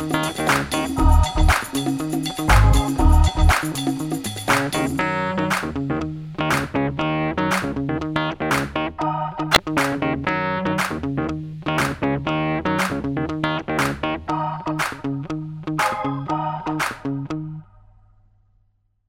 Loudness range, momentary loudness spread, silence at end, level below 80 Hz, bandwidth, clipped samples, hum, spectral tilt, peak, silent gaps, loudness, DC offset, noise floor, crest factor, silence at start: 6 LU; 9 LU; 1.45 s; -26 dBFS; 17 kHz; under 0.1%; none; -5 dB/octave; 0 dBFS; none; -22 LUFS; under 0.1%; -64 dBFS; 22 dB; 0 s